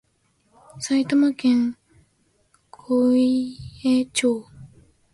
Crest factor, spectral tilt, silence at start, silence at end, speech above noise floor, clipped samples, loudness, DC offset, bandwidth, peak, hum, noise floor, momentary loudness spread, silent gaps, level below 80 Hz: 14 dB; -4.5 dB/octave; 0.75 s; 0.45 s; 46 dB; under 0.1%; -21 LUFS; under 0.1%; 11.5 kHz; -10 dBFS; none; -66 dBFS; 9 LU; none; -58 dBFS